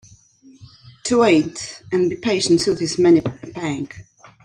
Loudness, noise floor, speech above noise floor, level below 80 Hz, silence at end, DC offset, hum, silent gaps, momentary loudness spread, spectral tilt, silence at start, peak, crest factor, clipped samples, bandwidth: -19 LUFS; -49 dBFS; 31 dB; -54 dBFS; 0.45 s; under 0.1%; none; none; 14 LU; -5 dB/octave; 0.6 s; -4 dBFS; 16 dB; under 0.1%; 10.5 kHz